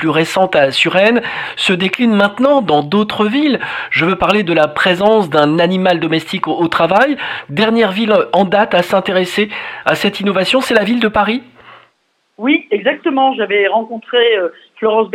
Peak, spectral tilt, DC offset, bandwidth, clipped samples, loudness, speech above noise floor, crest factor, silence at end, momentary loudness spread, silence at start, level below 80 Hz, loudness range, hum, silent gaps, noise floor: 0 dBFS; -5.5 dB/octave; under 0.1%; 15.5 kHz; under 0.1%; -13 LUFS; 48 dB; 14 dB; 0 s; 6 LU; 0 s; -50 dBFS; 3 LU; none; none; -61 dBFS